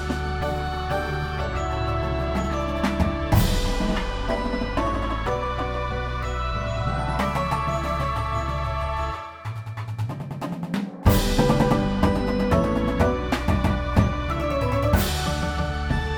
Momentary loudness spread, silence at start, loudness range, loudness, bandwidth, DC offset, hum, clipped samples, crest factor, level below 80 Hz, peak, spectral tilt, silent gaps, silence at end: 7 LU; 0 s; 5 LU; -25 LUFS; 19 kHz; 0.3%; none; under 0.1%; 20 dB; -30 dBFS; -4 dBFS; -6 dB/octave; none; 0 s